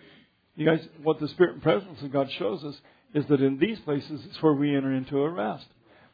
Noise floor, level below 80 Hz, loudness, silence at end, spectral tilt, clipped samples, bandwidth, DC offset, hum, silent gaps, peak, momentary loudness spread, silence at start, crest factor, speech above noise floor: -58 dBFS; -66 dBFS; -27 LUFS; 0.5 s; -9.5 dB/octave; under 0.1%; 5 kHz; under 0.1%; none; none; -8 dBFS; 9 LU; 0.55 s; 20 dB; 32 dB